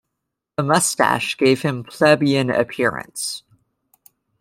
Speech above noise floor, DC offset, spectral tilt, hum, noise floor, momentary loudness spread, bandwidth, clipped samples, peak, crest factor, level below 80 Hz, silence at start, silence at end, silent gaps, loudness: 61 dB; under 0.1%; -4 dB/octave; none; -80 dBFS; 11 LU; 16.5 kHz; under 0.1%; -2 dBFS; 18 dB; -60 dBFS; 0.6 s; 1 s; none; -19 LUFS